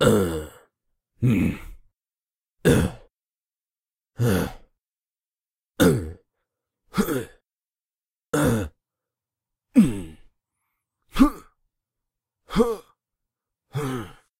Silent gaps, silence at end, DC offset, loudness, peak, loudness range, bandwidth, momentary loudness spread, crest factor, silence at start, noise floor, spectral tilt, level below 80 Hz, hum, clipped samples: 7.68-7.72 s; 0.3 s; under 0.1%; -24 LUFS; -4 dBFS; 3 LU; 16 kHz; 15 LU; 24 dB; 0 s; under -90 dBFS; -6.5 dB/octave; -42 dBFS; none; under 0.1%